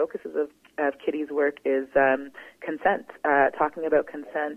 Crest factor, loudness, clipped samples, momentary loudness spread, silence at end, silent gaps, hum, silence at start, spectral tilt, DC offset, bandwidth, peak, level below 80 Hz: 18 dB; -26 LUFS; under 0.1%; 11 LU; 0 s; none; none; 0 s; -6.5 dB/octave; under 0.1%; 6.2 kHz; -8 dBFS; -66 dBFS